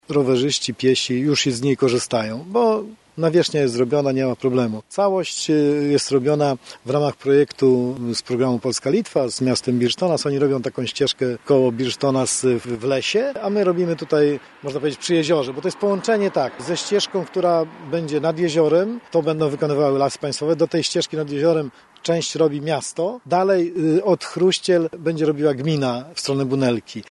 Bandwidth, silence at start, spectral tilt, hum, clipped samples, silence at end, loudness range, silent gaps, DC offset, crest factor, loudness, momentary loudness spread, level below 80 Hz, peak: 11.5 kHz; 0.1 s; -5 dB/octave; none; under 0.1%; 0.1 s; 1 LU; none; under 0.1%; 14 dB; -20 LUFS; 6 LU; -62 dBFS; -4 dBFS